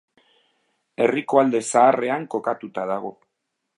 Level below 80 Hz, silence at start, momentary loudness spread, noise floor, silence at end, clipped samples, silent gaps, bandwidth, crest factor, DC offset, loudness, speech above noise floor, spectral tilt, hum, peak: -78 dBFS; 1 s; 12 LU; -78 dBFS; 0.65 s; under 0.1%; none; 11.5 kHz; 20 dB; under 0.1%; -21 LUFS; 58 dB; -4.5 dB/octave; none; -2 dBFS